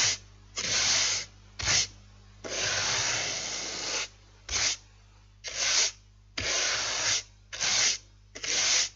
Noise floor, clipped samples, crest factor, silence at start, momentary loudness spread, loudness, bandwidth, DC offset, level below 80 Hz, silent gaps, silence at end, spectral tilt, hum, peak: -56 dBFS; under 0.1%; 18 dB; 0 s; 14 LU; -27 LUFS; 12.5 kHz; under 0.1%; -54 dBFS; none; 0.05 s; 0.5 dB/octave; 50 Hz at -55 dBFS; -12 dBFS